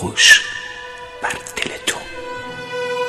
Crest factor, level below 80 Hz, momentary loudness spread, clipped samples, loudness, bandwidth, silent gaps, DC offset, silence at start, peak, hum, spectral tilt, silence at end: 20 dB; -50 dBFS; 21 LU; under 0.1%; -15 LUFS; 13.5 kHz; none; under 0.1%; 0 s; 0 dBFS; none; -0.5 dB/octave; 0 s